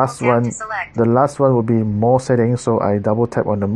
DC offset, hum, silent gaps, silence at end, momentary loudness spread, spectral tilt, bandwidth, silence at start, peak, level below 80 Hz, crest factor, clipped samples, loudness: under 0.1%; none; none; 0 s; 4 LU; -7.5 dB/octave; 11 kHz; 0 s; 0 dBFS; -50 dBFS; 16 dB; under 0.1%; -17 LUFS